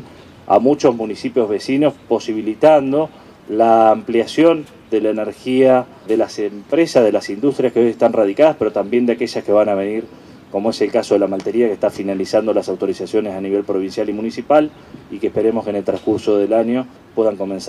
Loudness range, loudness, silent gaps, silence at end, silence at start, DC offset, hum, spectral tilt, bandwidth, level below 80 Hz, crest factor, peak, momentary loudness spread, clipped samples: 4 LU; -17 LUFS; none; 0 s; 0 s; under 0.1%; none; -6 dB/octave; 12.5 kHz; -58 dBFS; 16 dB; 0 dBFS; 9 LU; under 0.1%